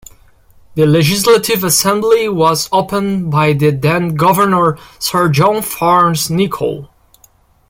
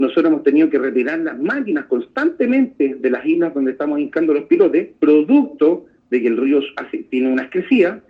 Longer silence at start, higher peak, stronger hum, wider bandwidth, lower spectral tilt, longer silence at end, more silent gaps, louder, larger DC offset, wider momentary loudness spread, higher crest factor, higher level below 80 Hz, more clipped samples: first, 0.75 s vs 0 s; about the same, 0 dBFS vs -2 dBFS; neither; first, 16.5 kHz vs 5.2 kHz; second, -4.5 dB/octave vs -8 dB/octave; first, 0.85 s vs 0.1 s; neither; first, -12 LUFS vs -17 LUFS; neither; about the same, 6 LU vs 7 LU; about the same, 14 dB vs 14 dB; first, -46 dBFS vs -64 dBFS; neither